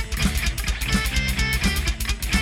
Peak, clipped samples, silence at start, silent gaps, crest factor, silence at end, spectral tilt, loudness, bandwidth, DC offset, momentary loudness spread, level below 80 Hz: -6 dBFS; under 0.1%; 0 s; none; 16 dB; 0 s; -3.5 dB/octave; -23 LUFS; 17 kHz; under 0.1%; 4 LU; -26 dBFS